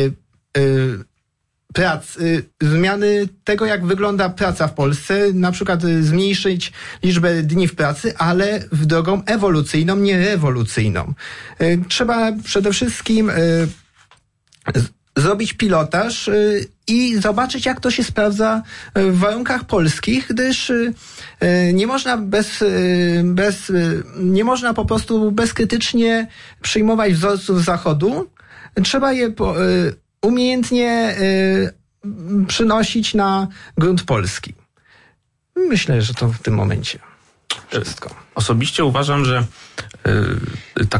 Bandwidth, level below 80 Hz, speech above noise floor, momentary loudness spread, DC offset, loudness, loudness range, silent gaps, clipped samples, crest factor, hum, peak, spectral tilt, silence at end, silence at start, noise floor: 11.5 kHz; -42 dBFS; 54 dB; 8 LU; under 0.1%; -17 LUFS; 3 LU; none; under 0.1%; 12 dB; none; -6 dBFS; -5.5 dB/octave; 0 s; 0 s; -71 dBFS